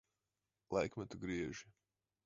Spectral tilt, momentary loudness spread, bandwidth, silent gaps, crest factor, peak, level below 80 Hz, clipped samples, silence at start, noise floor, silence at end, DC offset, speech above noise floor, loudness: -5.5 dB/octave; 7 LU; 7.6 kHz; none; 22 dB; -24 dBFS; -66 dBFS; under 0.1%; 0.7 s; under -90 dBFS; 0.55 s; under 0.1%; over 48 dB; -43 LUFS